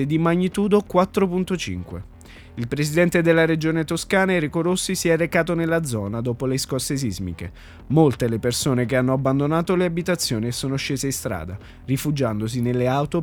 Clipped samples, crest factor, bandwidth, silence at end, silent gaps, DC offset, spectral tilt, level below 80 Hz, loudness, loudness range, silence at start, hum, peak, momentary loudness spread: under 0.1%; 20 dB; 19.5 kHz; 0 s; none; under 0.1%; -5.5 dB/octave; -46 dBFS; -21 LUFS; 3 LU; 0 s; none; -2 dBFS; 11 LU